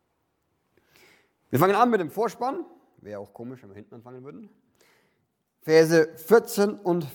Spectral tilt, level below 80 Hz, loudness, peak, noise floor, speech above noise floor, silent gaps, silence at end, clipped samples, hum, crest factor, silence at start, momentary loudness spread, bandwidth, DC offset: -5.5 dB/octave; -74 dBFS; -22 LUFS; -6 dBFS; -74 dBFS; 50 dB; none; 0 s; under 0.1%; none; 20 dB; 1.5 s; 24 LU; 19 kHz; under 0.1%